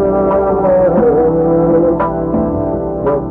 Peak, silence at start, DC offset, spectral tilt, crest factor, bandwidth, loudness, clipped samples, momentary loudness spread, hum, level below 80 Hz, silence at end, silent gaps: -4 dBFS; 0 s; under 0.1%; -12 dB/octave; 8 dB; 3.3 kHz; -13 LUFS; under 0.1%; 6 LU; none; -32 dBFS; 0 s; none